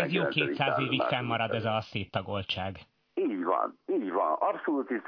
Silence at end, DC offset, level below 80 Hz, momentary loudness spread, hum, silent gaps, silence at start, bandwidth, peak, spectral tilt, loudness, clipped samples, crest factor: 0 s; under 0.1%; -68 dBFS; 7 LU; none; none; 0 s; 5.4 kHz; -10 dBFS; -7.5 dB/octave; -30 LUFS; under 0.1%; 20 dB